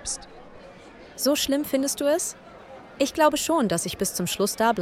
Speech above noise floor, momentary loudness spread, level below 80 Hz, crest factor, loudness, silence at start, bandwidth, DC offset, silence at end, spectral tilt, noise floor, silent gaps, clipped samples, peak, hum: 22 dB; 22 LU; -54 dBFS; 20 dB; -24 LUFS; 0 s; 17 kHz; under 0.1%; 0 s; -3 dB/octave; -46 dBFS; none; under 0.1%; -6 dBFS; none